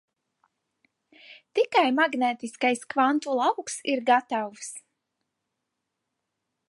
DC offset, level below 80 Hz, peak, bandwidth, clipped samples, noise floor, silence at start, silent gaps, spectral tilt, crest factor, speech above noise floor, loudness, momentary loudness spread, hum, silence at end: under 0.1%; -84 dBFS; -8 dBFS; 11.5 kHz; under 0.1%; -82 dBFS; 1.3 s; none; -2.5 dB/octave; 20 dB; 57 dB; -25 LUFS; 11 LU; none; 1.9 s